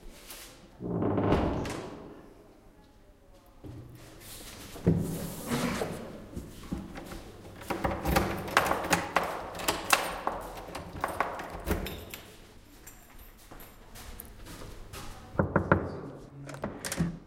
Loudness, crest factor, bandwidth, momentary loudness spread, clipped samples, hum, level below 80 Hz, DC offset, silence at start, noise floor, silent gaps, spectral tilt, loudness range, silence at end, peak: -32 LUFS; 30 dB; 17 kHz; 22 LU; under 0.1%; none; -46 dBFS; under 0.1%; 0 s; -57 dBFS; none; -4.5 dB/octave; 12 LU; 0 s; -4 dBFS